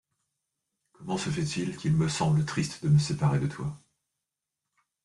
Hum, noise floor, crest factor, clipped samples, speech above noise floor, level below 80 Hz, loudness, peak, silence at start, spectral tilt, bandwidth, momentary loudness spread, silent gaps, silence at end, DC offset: none; -87 dBFS; 16 dB; under 0.1%; 60 dB; -58 dBFS; -28 LUFS; -14 dBFS; 1 s; -6 dB/octave; 11.5 kHz; 10 LU; none; 1.25 s; under 0.1%